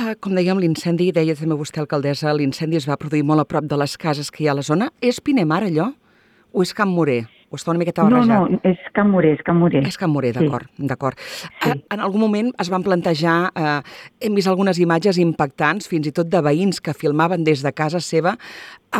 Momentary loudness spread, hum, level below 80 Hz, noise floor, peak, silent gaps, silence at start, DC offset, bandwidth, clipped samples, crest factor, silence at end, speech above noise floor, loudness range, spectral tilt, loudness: 7 LU; none; -58 dBFS; -55 dBFS; -2 dBFS; none; 0 s; under 0.1%; 14.5 kHz; under 0.1%; 16 dB; 0 s; 37 dB; 3 LU; -6.5 dB/octave; -19 LUFS